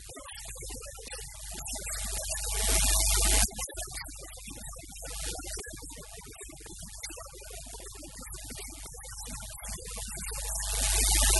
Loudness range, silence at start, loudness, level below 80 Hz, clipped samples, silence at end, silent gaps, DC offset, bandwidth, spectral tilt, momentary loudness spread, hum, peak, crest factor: 13 LU; 0 s; -31 LUFS; -36 dBFS; under 0.1%; 0 s; none; under 0.1%; 12 kHz; -1.5 dB/octave; 19 LU; none; -8 dBFS; 24 dB